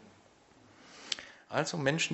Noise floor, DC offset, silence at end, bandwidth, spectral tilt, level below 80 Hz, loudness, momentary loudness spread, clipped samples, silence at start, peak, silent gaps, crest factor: -62 dBFS; under 0.1%; 0 s; 8.2 kHz; -3.5 dB/octave; -74 dBFS; -34 LUFS; 19 LU; under 0.1%; 0 s; -10 dBFS; none; 28 dB